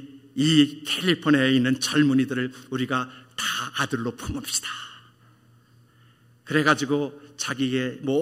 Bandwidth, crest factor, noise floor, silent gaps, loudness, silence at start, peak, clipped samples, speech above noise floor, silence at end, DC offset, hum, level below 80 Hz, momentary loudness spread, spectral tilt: 16 kHz; 20 dB; -56 dBFS; none; -24 LUFS; 0 s; -4 dBFS; under 0.1%; 33 dB; 0 s; under 0.1%; none; -56 dBFS; 12 LU; -4 dB/octave